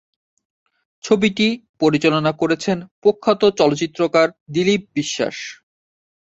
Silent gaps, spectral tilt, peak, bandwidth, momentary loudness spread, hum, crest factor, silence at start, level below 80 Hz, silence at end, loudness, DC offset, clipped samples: 1.69-1.74 s, 2.91-3.02 s, 4.41-4.46 s; -5 dB/octave; -2 dBFS; 8 kHz; 8 LU; none; 18 dB; 1.05 s; -58 dBFS; 0.75 s; -18 LUFS; under 0.1%; under 0.1%